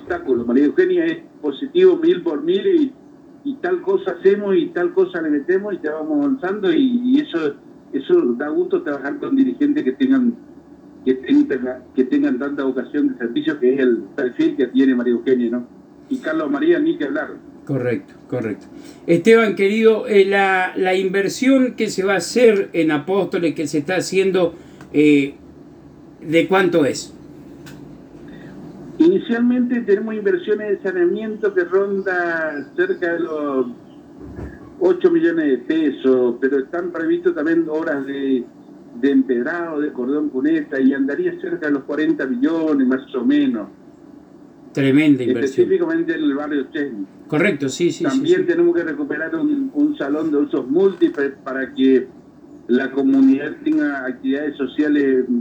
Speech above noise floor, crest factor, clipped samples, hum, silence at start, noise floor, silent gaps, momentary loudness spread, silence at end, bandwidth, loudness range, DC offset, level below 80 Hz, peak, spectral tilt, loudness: 25 dB; 18 dB; under 0.1%; none; 0 s; -43 dBFS; none; 11 LU; 0 s; 9.2 kHz; 4 LU; under 0.1%; -58 dBFS; 0 dBFS; -6 dB/octave; -18 LUFS